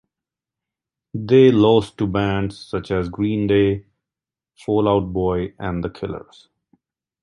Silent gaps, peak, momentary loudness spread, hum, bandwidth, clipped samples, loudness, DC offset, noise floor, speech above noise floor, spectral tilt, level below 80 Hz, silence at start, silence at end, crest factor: none; -2 dBFS; 17 LU; none; 10.5 kHz; under 0.1%; -19 LUFS; under 0.1%; -89 dBFS; 70 dB; -8 dB/octave; -42 dBFS; 1.15 s; 1 s; 18 dB